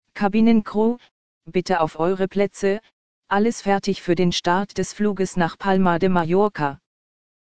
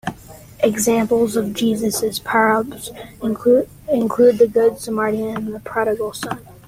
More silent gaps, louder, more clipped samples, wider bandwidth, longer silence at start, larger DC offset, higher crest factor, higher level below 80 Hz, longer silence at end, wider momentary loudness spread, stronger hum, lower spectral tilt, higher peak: first, 1.11-1.41 s, 2.93-3.22 s vs none; second, -21 LUFS vs -18 LUFS; neither; second, 9.4 kHz vs 16.5 kHz; about the same, 0 s vs 0.05 s; first, 2% vs under 0.1%; about the same, 16 dB vs 16 dB; about the same, -48 dBFS vs -50 dBFS; first, 0.65 s vs 0.15 s; second, 8 LU vs 12 LU; neither; first, -6 dB/octave vs -4.5 dB/octave; about the same, -4 dBFS vs -2 dBFS